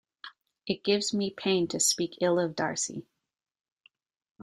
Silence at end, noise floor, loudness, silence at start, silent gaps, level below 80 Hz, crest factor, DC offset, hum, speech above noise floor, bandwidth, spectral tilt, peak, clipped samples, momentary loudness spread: 1.4 s; -51 dBFS; -28 LUFS; 0.25 s; none; -72 dBFS; 18 dB; under 0.1%; none; 22 dB; 15 kHz; -3 dB/octave; -12 dBFS; under 0.1%; 20 LU